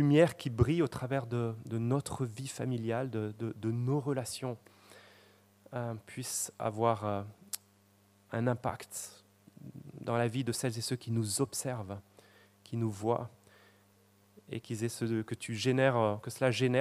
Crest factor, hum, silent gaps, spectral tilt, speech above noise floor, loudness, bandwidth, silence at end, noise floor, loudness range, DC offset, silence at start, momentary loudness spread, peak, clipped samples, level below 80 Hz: 22 dB; none; none; -5.5 dB/octave; 33 dB; -34 LUFS; 15.5 kHz; 0 s; -66 dBFS; 4 LU; under 0.1%; 0 s; 14 LU; -12 dBFS; under 0.1%; -62 dBFS